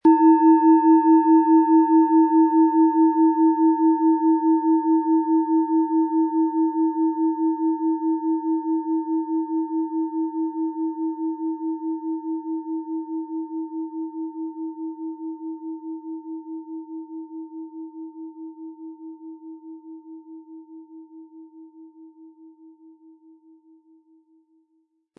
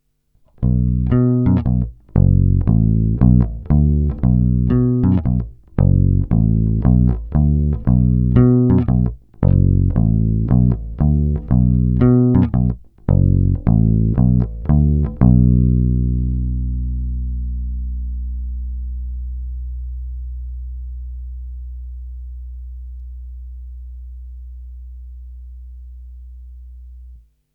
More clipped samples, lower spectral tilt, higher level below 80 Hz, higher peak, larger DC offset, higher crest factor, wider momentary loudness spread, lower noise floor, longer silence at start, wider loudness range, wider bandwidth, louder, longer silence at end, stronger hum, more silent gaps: neither; second, -10.5 dB/octave vs -14 dB/octave; second, -82 dBFS vs -22 dBFS; second, -6 dBFS vs 0 dBFS; neither; about the same, 16 dB vs 16 dB; about the same, 22 LU vs 21 LU; first, -69 dBFS vs -57 dBFS; second, 0.05 s vs 0.6 s; first, 22 LU vs 19 LU; about the same, 2.8 kHz vs 3 kHz; second, -21 LUFS vs -17 LUFS; first, 2.7 s vs 0.4 s; neither; neither